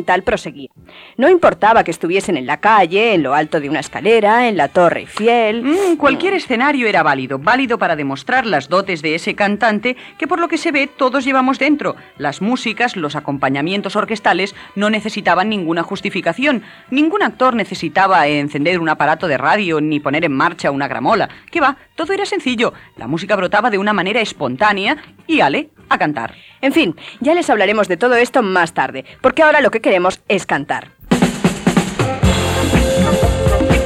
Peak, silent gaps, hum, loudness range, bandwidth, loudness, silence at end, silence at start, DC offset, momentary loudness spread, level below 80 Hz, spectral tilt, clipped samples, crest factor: 0 dBFS; none; none; 3 LU; 16 kHz; -15 LUFS; 0 s; 0 s; under 0.1%; 8 LU; -34 dBFS; -5 dB/octave; under 0.1%; 14 dB